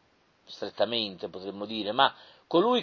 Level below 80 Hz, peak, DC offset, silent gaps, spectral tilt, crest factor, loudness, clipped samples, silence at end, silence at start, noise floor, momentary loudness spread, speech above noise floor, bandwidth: -72 dBFS; -8 dBFS; under 0.1%; none; -5.5 dB/octave; 22 dB; -29 LUFS; under 0.1%; 0 s; 0.5 s; -62 dBFS; 14 LU; 33 dB; 6.6 kHz